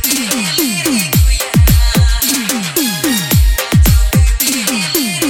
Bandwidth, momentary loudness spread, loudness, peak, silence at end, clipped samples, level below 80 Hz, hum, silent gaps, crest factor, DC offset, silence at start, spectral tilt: 17.5 kHz; 4 LU; -12 LUFS; 0 dBFS; 0 s; under 0.1%; -16 dBFS; none; none; 12 dB; under 0.1%; 0 s; -4 dB/octave